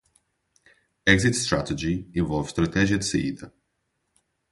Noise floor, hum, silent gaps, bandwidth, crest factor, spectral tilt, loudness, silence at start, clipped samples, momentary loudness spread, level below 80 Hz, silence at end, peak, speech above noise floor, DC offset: -76 dBFS; none; none; 11.5 kHz; 24 dB; -4.5 dB/octave; -24 LUFS; 1.05 s; under 0.1%; 8 LU; -44 dBFS; 1 s; -2 dBFS; 52 dB; under 0.1%